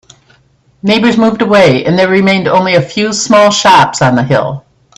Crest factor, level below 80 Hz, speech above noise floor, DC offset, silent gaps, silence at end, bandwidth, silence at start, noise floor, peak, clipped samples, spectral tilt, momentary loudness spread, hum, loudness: 10 dB; -46 dBFS; 41 dB; under 0.1%; none; 0.4 s; 12.5 kHz; 0.85 s; -50 dBFS; 0 dBFS; 0.2%; -4.5 dB/octave; 7 LU; none; -8 LUFS